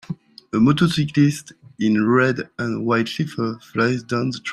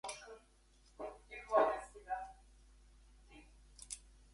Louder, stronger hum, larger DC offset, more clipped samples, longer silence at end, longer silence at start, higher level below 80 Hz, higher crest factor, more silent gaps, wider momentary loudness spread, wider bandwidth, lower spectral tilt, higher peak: first, -20 LUFS vs -40 LUFS; neither; neither; neither; second, 0 s vs 0.35 s; about the same, 0.1 s vs 0.05 s; first, -56 dBFS vs -64 dBFS; second, 16 dB vs 26 dB; neither; second, 10 LU vs 28 LU; first, 14 kHz vs 11.5 kHz; first, -6.5 dB/octave vs -3 dB/octave; first, -4 dBFS vs -16 dBFS